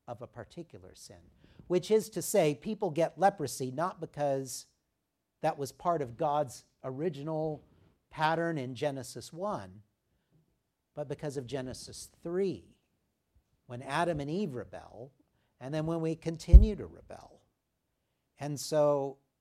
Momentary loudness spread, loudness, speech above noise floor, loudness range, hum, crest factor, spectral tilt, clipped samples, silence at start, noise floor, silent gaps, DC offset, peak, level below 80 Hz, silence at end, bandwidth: 19 LU; -32 LUFS; 52 dB; 10 LU; none; 28 dB; -6 dB/octave; under 0.1%; 0.1 s; -83 dBFS; none; under 0.1%; -4 dBFS; -36 dBFS; 0.25 s; 14.5 kHz